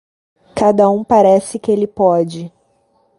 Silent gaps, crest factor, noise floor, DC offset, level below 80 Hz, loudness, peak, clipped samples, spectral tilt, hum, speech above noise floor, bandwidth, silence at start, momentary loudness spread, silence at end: none; 14 dB; -58 dBFS; under 0.1%; -52 dBFS; -14 LUFS; 0 dBFS; under 0.1%; -7 dB/octave; none; 45 dB; 11.5 kHz; 0.55 s; 16 LU; 0.7 s